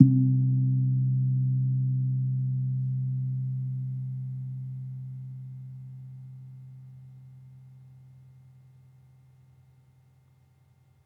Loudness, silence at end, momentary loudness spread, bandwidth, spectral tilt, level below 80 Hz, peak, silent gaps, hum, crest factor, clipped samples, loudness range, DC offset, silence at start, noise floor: -28 LUFS; 3.15 s; 23 LU; 0.8 kHz; -13.5 dB/octave; -76 dBFS; -2 dBFS; none; none; 26 dB; under 0.1%; 23 LU; under 0.1%; 0 s; -62 dBFS